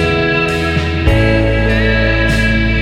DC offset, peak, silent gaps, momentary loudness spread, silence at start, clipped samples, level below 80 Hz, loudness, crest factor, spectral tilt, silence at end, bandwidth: under 0.1%; 0 dBFS; none; 2 LU; 0 s; under 0.1%; -18 dBFS; -13 LUFS; 12 dB; -6.5 dB/octave; 0 s; 12 kHz